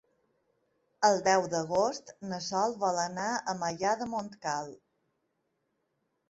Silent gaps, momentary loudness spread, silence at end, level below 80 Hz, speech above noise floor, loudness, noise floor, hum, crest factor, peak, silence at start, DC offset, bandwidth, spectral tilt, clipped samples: none; 11 LU; 1.55 s; -72 dBFS; 49 dB; -30 LUFS; -79 dBFS; none; 22 dB; -10 dBFS; 1 s; under 0.1%; 8.2 kHz; -3.5 dB/octave; under 0.1%